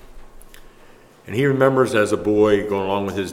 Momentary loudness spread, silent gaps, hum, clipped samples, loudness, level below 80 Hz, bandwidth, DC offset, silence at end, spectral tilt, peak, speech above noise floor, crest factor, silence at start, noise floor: 6 LU; none; none; under 0.1%; -19 LUFS; -46 dBFS; 15.5 kHz; under 0.1%; 0 s; -6 dB/octave; -2 dBFS; 29 dB; 20 dB; 0.05 s; -47 dBFS